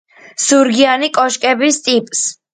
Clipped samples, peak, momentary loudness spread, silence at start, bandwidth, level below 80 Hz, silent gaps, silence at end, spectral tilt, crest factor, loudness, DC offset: under 0.1%; 0 dBFS; 7 LU; 0.4 s; 9.6 kHz; -62 dBFS; none; 0.2 s; -1.5 dB/octave; 14 dB; -13 LUFS; under 0.1%